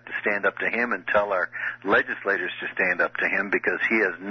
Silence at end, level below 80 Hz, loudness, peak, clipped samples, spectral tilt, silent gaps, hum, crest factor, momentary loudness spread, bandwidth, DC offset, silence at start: 0 s; -64 dBFS; -24 LUFS; -10 dBFS; under 0.1%; -6 dB/octave; none; none; 14 dB; 4 LU; 6.4 kHz; under 0.1%; 0.05 s